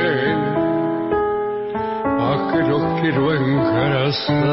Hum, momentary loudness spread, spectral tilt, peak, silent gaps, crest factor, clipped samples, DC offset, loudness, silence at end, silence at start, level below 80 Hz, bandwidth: none; 4 LU; -11 dB/octave; -6 dBFS; none; 12 dB; under 0.1%; under 0.1%; -19 LUFS; 0 s; 0 s; -46 dBFS; 5.8 kHz